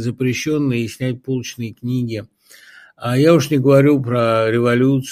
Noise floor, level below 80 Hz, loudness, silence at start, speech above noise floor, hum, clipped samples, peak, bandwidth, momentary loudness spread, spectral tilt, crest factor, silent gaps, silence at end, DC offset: -45 dBFS; -56 dBFS; -17 LUFS; 0 s; 29 dB; none; under 0.1%; 0 dBFS; 15.5 kHz; 13 LU; -6.5 dB/octave; 16 dB; none; 0 s; under 0.1%